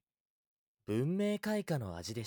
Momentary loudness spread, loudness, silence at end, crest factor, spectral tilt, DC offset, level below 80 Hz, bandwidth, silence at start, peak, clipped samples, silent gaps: 7 LU; -36 LUFS; 0 s; 14 dB; -6.5 dB/octave; under 0.1%; -68 dBFS; 20 kHz; 0.9 s; -22 dBFS; under 0.1%; none